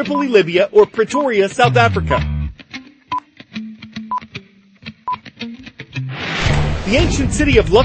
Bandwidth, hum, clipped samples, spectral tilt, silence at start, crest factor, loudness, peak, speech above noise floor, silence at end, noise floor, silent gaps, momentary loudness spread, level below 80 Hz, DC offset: 8.8 kHz; none; under 0.1%; -5.5 dB/octave; 0 s; 16 dB; -16 LUFS; 0 dBFS; 28 dB; 0 s; -41 dBFS; none; 20 LU; -28 dBFS; under 0.1%